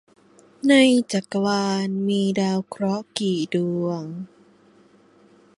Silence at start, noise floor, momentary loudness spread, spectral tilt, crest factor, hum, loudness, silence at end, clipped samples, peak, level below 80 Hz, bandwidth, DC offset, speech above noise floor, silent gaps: 0.65 s; -55 dBFS; 12 LU; -5.5 dB/octave; 18 dB; 50 Hz at -40 dBFS; -22 LUFS; 1.3 s; under 0.1%; -4 dBFS; -68 dBFS; 11.5 kHz; under 0.1%; 33 dB; none